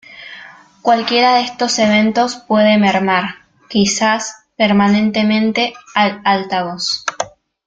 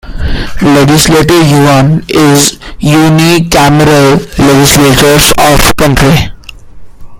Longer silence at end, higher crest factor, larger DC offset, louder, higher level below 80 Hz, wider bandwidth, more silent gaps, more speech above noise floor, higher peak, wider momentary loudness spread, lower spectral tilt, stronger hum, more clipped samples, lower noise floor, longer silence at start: first, 0.4 s vs 0 s; first, 14 dB vs 6 dB; neither; second, -14 LUFS vs -5 LUFS; second, -54 dBFS vs -20 dBFS; second, 9 kHz vs over 20 kHz; neither; first, 25 dB vs 21 dB; about the same, -2 dBFS vs 0 dBFS; first, 14 LU vs 6 LU; about the same, -4 dB/octave vs -4.5 dB/octave; neither; second, under 0.1% vs 2%; first, -39 dBFS vs -26 dBFS; about the same, 0.1 s vs 0.05 s